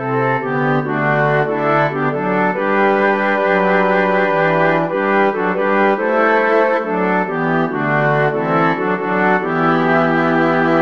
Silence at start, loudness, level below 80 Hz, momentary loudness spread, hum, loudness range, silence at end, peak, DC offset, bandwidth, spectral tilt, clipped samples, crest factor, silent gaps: 0 s; -15 LUFS; -66 dBFS; 3 LU; none; 1 LU; 0 s; -2 dBFS; 0.6%; 7 kHz; -8 dB/octave; under 0.1%; 14 dB; none